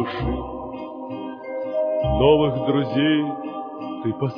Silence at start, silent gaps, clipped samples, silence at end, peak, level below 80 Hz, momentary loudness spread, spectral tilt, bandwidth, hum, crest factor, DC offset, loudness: 0 s; none; under 0.1%; 0 s; -4 dBFS; -38 dBFS; 15 LU; -9.5 dB/octave; 5.2 kHz; none; 20 dB; under 0.1%; -23 LUFS